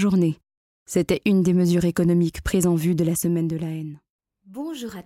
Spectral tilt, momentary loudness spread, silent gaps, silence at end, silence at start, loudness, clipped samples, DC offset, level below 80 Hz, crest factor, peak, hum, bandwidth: -6.5 dB/octave; 14 LU; 0.57-0.86 s, 4.10-4.19 s; 0.05 s; 0 s; -22 LUFS; under 0.1%; under 0.1%; -44 dBFS; 16 dB; -6 dBFS; none; 15.5 kHz